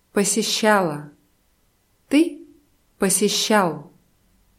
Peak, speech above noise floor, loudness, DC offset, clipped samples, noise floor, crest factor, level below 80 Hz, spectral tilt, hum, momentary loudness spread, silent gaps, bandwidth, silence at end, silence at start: -4 dBFS; 44 dB; -20 LUFS; under 0.1%; under 0.1%; -63 dBFS; 18 dB; -64 dBFS; -3 dB/octave; none; 8 LU; none; 16.5 kHz; 0.7 s; 0.15 s